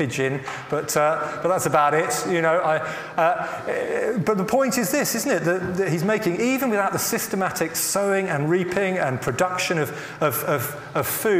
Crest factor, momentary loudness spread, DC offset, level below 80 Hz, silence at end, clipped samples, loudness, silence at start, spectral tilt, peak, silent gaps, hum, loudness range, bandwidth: 18 dB; 5 LU; under 0.1%; -58 dBFS; 0 s; under 0.1%; -22 LUFS; 0 s; -4.5 dB/octave; -4 dBFS; none; none; 1 LU; 16 kHz